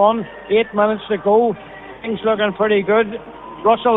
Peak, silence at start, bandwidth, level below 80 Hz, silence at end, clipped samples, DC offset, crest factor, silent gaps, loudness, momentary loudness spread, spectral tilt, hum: -2 dBFS; 0 s; 4 kHz; -52 dBFS; 0 s; under 0.1%; under 0.1%; 16 dB; none; -18 LUFS; 15 LU; -9 dB/octave; none